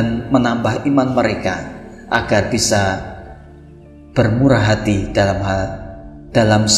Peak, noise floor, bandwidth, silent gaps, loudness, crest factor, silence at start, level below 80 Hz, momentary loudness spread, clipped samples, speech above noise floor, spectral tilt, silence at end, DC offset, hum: 0 dBFS; -40 dBFS; 13.5 kHz; none; -16 LUFS; 16 dB; 0 s; -36 dBFS; 18 LU; under 0.1%; 24 dB; -5 dB/octave; 0 s; under 0.1%; none